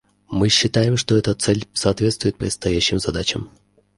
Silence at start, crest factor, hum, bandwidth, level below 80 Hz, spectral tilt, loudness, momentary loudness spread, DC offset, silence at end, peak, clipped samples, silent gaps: 0.3 s; 18 dB; none; 11.5 kHz; -40 dBFS; -4.5 dB/octave; -19 LUFS; 8 LU; under 0.1%; 0.5 s; -2 dBFS; under 0.1%; none